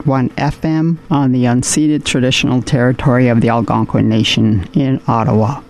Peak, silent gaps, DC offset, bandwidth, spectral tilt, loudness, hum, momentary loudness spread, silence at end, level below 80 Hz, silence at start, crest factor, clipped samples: -2 dBFS; none; 0.1%; 13.5 kHz; -5.5 dB/octave; -13 LUFS; none; 4 LU; 0.05 s; -38 dBFS; 0 s; 10 dB; under 0.1%